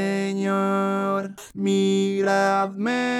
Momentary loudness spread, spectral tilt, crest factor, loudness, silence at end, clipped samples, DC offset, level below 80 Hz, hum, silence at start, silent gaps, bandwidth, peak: 6 LU; -5.5 dB/octave; 14 dB; -23 LUFS; 0 s; under 0.1%; under 0.1%; -70 dBFS; none; 0 s; none; 12.5 kHz; -8 dBFS